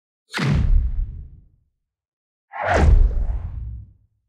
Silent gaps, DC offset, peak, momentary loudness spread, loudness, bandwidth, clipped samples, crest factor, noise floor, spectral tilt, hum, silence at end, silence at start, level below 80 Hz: 2.08-2.48 s; under 0.1%; -4 dBFS; 19 LU; -22 LUFS; 9.2 kHz; under 0.1%; 16 dB; -71 dBFS; -6.5 dB/octave; none; 0.45 s; 0.35 s; -22 dBFS